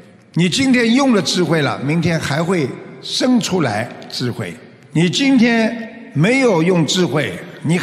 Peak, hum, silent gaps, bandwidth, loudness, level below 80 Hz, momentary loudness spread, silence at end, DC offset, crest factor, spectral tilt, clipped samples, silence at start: -2 dBFS; none; none; 14 kHz; -16 LUFS; -56 dBFS; 12 LU; 0 s; under 0.1%; 14 dB; -5 dB/octave; under 0.1%; 0.35 s